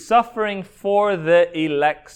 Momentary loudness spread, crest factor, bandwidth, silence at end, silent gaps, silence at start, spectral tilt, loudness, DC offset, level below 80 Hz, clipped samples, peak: 8 LU; 14 dB; 10 kHz; 0.15 s; none; 0 s; -5.5 dB/octave; -19 LUFS; under 0.1%; -56 dBFS; under 0.1%; -4 dBFS